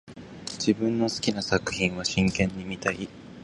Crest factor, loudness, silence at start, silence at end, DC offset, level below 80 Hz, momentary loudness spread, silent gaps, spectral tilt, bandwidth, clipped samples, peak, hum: 20 dB; -27 LUFS; 0.05 s; 0 s; under 0.1%; -48 dBFS; 13 LU; none; -4.5 dB/octave; 11.5 kHz; under 0.1%; -8 dBFS; none